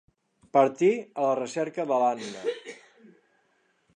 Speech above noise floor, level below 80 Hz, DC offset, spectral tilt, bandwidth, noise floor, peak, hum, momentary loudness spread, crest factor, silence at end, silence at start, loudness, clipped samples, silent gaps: 44 dB; -80 dBFS; under 0.1%; -5.5 dB/octave; 10 kHz; -69 dBFS; -8 dBFS; none; 11 LU; 20 dB; 1.2 s; 0.55 s; -26 LUFS; under 0.1%; none